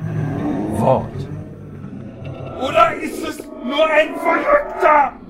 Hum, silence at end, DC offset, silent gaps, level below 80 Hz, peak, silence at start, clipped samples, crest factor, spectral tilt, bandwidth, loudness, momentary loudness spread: none; 0 s; under 0.1%; none; -44 dBFS; 0 dBFS; 0 s; under 0.1%; 18 dB; -6 dB/octave; 16 kHz; -17 LUFS; 18 LU